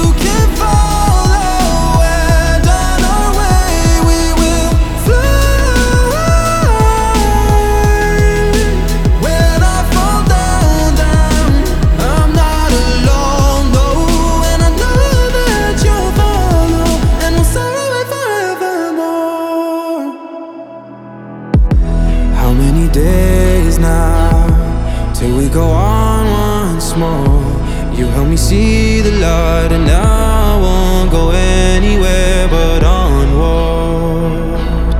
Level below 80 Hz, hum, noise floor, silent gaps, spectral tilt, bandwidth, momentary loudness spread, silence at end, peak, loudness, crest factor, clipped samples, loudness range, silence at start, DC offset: -12 dBFS; none; -30 dBFS; none; -5.5 dB/octave; 17 kHz; 5 LU; 0 s; 0 dBFS; -12 LUFS; 10 dB; under 0.1%; 3 LU; 0 s; under 0.1%